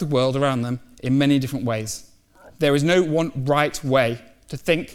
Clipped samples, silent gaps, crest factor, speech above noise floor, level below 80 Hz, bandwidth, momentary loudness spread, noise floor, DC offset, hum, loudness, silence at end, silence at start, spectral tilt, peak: under 0.1%; none; 16 dB; 29 dB; -50 dBFS; 16.5 kHz; 11 LU; -50 dBFS; under 0.1%; none; -21 LUFS; 0 s; 0 s; -5.5 dB/octave; -4 dBFS